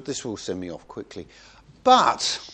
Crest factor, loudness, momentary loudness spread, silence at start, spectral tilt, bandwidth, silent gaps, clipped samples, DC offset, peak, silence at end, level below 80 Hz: 22 dB; -22 LUFS; 21 LU; 0 s; -2.5 dB/octave; 9.8 kHz; none; under 0.1%; under 0.1%; -4 dBFS; 0 s; -58 dBFS